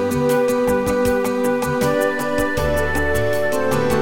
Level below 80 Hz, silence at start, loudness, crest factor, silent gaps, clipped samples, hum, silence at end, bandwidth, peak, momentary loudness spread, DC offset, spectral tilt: -34 dBFS; 0 s; -19 LUFS; 14 dB; none; under 0.1%; none; 0 s; 17 kHz; -4 dBFS; 2 LU; under 0.1%; -5.5 dB/octave